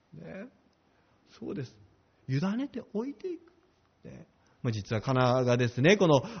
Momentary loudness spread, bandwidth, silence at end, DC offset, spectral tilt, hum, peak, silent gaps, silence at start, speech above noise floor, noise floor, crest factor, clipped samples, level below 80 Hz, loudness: 24 LU; 6.6 kHz; 0 s; under 0.1%; -5.5 dB/octave; none; -10 dBFS; none; 0.15 s; 39 dB; -67 dBFS; 22 dB; under 0.1%; -64 dBFS; -29 LUFS